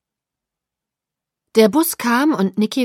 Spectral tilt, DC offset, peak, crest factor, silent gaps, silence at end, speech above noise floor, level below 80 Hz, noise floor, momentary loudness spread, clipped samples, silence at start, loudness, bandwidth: -4.5 dB/octave; under 0.1%; -2 dBFS; 18 dB; none; 0 s; 70 dB; -68 dBFS; -85 dBFS; 5 LU; under 0.1%; 1.55 s; -16 LUFS; 16.5 kHz